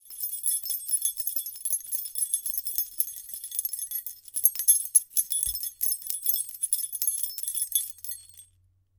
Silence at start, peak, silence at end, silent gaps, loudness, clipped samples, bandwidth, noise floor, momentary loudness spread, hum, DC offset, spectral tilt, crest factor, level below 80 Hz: 0.05 s; -2 dBFS; 0.55 s; none; -26 LUFS; under 0.1%; 19 kHz; -65 dBFS; 11 LU; none; under 0.1%; 3.5 dB/octave; 28 dB; -64 dBFS